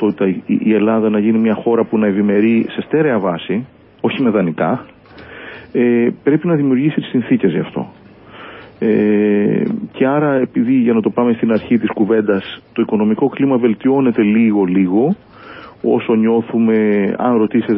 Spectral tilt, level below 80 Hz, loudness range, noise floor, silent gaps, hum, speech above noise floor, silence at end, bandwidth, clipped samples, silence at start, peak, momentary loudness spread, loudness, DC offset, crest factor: -13 dB/octave; -54 dBFS; 2 LU; -37 dBFS; none; none; 23 dB; 0 s; 3.9 kHz; under 0.1%; 0 s; 0 dBFS; 9 LU; -15 LUFS; under 0.1%; 14 dB